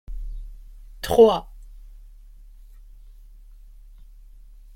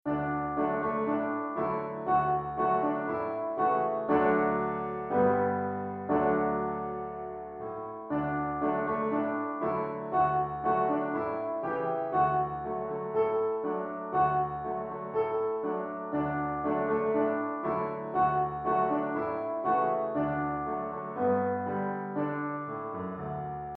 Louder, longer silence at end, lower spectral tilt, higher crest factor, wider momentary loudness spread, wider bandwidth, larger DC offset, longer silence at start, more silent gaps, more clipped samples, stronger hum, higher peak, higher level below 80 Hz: first, -19 LUFS vs -30 LUFS; first, 3 s vs 0 s; second, -5.5 dB/octave vs -10.5 dB/octave; first, 22 dB vs 16 dB; first, 26 LU vs 8 LU; first, 16.5 kHz vs 4.5 kHz; neither; about the same, 0.1 s vs 0.05 s; neither; neither; neither; first, -4 dBFS vs -14 dBFS; first, -40 dBFS vs -58 dBFS